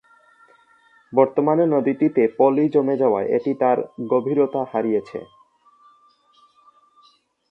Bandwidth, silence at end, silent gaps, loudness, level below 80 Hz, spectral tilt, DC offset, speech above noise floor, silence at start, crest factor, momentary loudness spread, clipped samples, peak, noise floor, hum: 5.6 kHz; 2.25 s; none; -20 LUFS; -70 dBFS; -10 dB/octave; under 0.1%; 39 dB; 1.1 s; 20 dB; 6 LU; under 0.1%; -2 dBFS; -58 dBFS; none